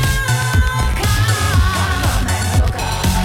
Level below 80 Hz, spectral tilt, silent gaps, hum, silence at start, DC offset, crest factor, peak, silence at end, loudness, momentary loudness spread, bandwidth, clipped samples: -20 dBFS; -4 dB/octave; none; none; 0 s; under 0.1%; 12 dB; -2 dBFS; 0 s; -16 LUFS; 3 LU; 17 kHz; under 0.1%